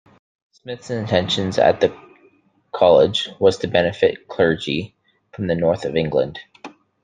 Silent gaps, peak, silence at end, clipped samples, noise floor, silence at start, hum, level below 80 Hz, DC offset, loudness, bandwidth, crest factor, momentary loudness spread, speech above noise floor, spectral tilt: none; -2 dBFS; 0.35 s; under 0.1%; -57 dBFS; 0.65 s; none; -54 dBFS; under 0.1%; -19 LUFS; 9.4 kHz; 18 dB; 17 LU; 38 dB; -5.5 dB/octave